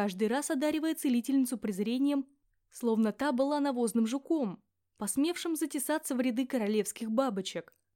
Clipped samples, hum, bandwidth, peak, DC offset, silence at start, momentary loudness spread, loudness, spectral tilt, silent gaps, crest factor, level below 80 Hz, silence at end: under 0.1%; none; 17 kHz; -14 dBFS; under 0.1%; 0 s; 6 LU; -31 LUFS; -4.5 dB/octave; none; 16 dB; -74 dBFS; 0.35 s